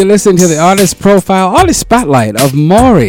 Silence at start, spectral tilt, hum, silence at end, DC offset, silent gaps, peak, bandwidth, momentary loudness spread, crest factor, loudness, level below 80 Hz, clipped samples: 0 s; -5 dB/octave; none; 0 s; under 0.1%; none; 0 dBFS; 18.5 kHz; 3 LU; 6 dB; -7 LUFS; -28 dBFS; under 0.1%